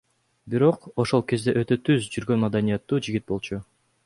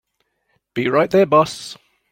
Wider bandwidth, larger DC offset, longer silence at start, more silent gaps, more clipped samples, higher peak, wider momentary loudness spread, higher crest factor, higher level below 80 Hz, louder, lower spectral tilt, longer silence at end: second, 11.5 kHz vs 16.5 kHz; neither; second, 0.45 s vs 0.75 s; neither; neither; second, -6 dBFS vs -2 dBFS; second, 8 LU vs 17 LU; about the same, 18 dB vs 18 dB; about the same, -54 dBFS vs -58 dBFS; second, -24 LUFS vs -16 LUFS; about the same, -6.5 dB/octave vs -5.5 dB/octave; about the same, 0.45 s vs 0.4 s